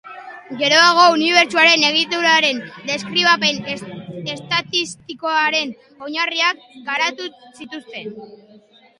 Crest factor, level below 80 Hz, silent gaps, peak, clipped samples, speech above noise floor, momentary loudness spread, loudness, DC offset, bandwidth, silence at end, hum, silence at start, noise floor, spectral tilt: 18 dB; -66 dBFS; none; 0 dBFS; under 0.1%; 31 dB; 21 LU; -15 LUFS; under 0.1%; 11.5 kHz; 0.65 s; none; 0.05 s; -49 dBFS; -2 dB/octave